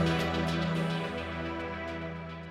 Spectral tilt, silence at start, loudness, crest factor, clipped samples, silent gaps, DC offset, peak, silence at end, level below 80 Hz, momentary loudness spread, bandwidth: -6 dB/octave; 0 s; -33 LUFS; 16 dB; under 0.1%; none; under 0.1%; -16 dBFS; 0 s; -48 dBFS; 9 LU; 13.5 kHz